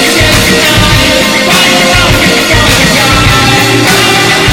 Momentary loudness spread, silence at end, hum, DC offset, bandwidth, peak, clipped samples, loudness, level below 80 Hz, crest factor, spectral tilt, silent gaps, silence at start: 1 LU; 0 s; none; under 0.1%; 18.5 kHz; 0 dBFS; 0.6%; -5 LUFS; -20 dBFS; 6 dB; -3 dB/octave; none; 0 s